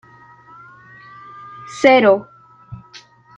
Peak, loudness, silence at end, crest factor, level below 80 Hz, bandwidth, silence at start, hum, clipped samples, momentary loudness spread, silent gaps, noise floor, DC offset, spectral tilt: -2 dBFS; -13 LUFS; 0.6 s; 18 dB; -60 dBFS; 9 kHz; 1.65 s; none; under 0.1%; 28 LU; none; -45 dBFS; under 0.1%; -5 dB/octave